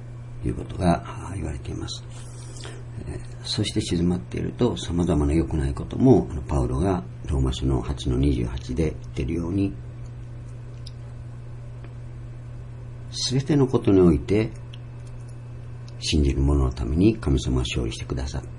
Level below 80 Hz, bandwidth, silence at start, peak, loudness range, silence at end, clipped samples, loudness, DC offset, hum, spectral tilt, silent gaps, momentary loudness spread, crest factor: -34 dBFS; 11 kHz; 0 s; -4 dBFS; 9 LU; 0 s; under 0.1%; -24 LUFS; under 0.1%; none; -6.5 dB/octave; none; 18 LU; 20 dB